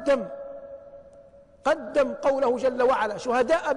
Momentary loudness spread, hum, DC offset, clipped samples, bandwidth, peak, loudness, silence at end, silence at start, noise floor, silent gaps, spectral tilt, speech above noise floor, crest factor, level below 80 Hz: 17 LU; none; under 0.1%; under 0.1%; 10.5 kHz; -12 dBFS; -24 LUFS; 0 s; 0 s; -51 dBFS; none; -4.5 dB/octave; 28 dB; 14 dB; -56 dBFS